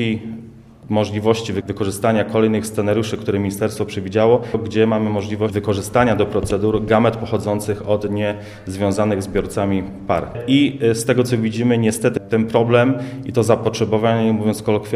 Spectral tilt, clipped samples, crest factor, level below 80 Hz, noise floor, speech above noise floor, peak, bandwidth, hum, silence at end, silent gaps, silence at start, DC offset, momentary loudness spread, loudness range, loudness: -6 dB/octave; under 0.1%; 18 dB; -44 dBFS; -39 dBFS; 22 dB; 0 dBFS; 15 kHz; none; 0 s; none; 0 s; under 0.1%; 7 LU; 3 LU; -18 LUFS